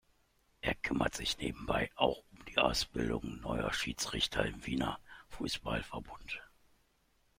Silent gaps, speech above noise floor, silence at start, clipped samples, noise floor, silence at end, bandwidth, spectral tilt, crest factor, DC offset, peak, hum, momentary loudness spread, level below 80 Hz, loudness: none; 37 dB; 0.65 s; under 0.1%; -73 dBFS; 0.95 s; 16.5 kHz; -4 dB/octave; 24 dB; under 0.1%; -12 dBFS; none; 13 LU; -52 dBFS; -36 LUFS